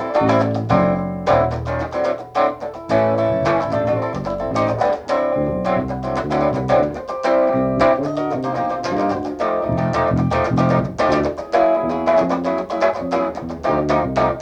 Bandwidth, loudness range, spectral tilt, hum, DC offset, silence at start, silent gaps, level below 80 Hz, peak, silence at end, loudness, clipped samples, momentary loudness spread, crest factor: 9.2 kHz; 2 LU; -7.5 dB/octave; none; under 0.1%; 0 s; none; -40 dBFS; -2 dBFS; 0 s; -19 LUFS; under 0.1%; 5 LU; 16 dB